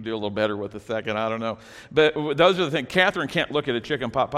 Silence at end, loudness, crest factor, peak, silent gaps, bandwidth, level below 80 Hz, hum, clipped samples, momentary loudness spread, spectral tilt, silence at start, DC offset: 0 s; -23 LUFS; 18 dB; -4 dBFS; none; 13.5 kHz; -56 dBFS; none; under 0.1%; 10 LU; -5.5 dB/octave; 0 s; under 0.1%